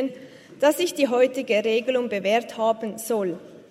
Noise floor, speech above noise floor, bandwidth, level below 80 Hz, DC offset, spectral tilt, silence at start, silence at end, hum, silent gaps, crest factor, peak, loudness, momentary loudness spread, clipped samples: -43 dBFS; 21 dB; 16 kHz; -76 dBFS; under 0.1%; -4 dB/octave; 0 s; 0.1 s; none; none; 16 dB; -6 dBFS; -23 LUFS; 9 LU; under 0.1%